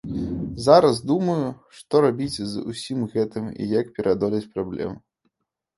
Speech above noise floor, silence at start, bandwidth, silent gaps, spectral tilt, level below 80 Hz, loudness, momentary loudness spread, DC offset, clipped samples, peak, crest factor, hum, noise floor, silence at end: 55 dB; 0.05 s; 11.5 kHz; none; -6.5 dB/octave; -50 dBFS; -23 LUFS; 14 LU; under 0.1%; under 0.1%; -2 dBFS; 22 dB; none; -77 dBFS; 0.8 s